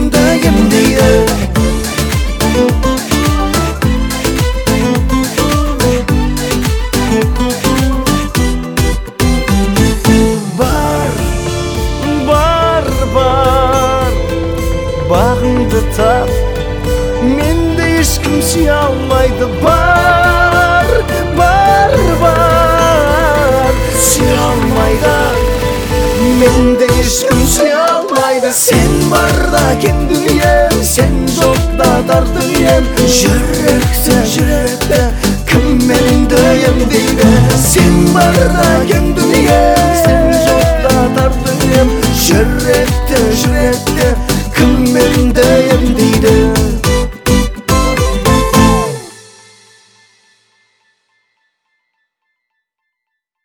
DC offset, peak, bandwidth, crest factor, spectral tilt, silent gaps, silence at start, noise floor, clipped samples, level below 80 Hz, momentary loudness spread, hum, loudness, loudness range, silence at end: under 0.1%; 0 dBFS; over 20 kHz; 10 dB; -5 dB/octave; none; 0 s; -75 dBFS; under 0.1%; -18 dBFS; 6 LU; none; -10 LUFS; 4 LU; 4.25 s